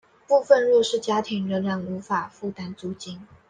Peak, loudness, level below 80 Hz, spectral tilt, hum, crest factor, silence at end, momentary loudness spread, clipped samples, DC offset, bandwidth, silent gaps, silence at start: -4 dBFS; -23 LUFS; -68 dBFS; -5 dB/octave; none; 20 dB; 0.25 s; 16 LU; under 0.1%; under 0.1%; 9.6 kHz; none; 0.3 s